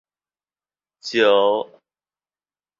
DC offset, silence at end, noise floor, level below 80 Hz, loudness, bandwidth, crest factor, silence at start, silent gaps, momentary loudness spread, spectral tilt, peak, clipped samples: under 0.1%; 1.15 s; under -90 dBFS; -70 dBFS; -18 LUFS; 7.6 kHz; 20 dB; 1.05 s; none; 20 LU; -3.5 dB/octave; -4 dBFS; under 0.1%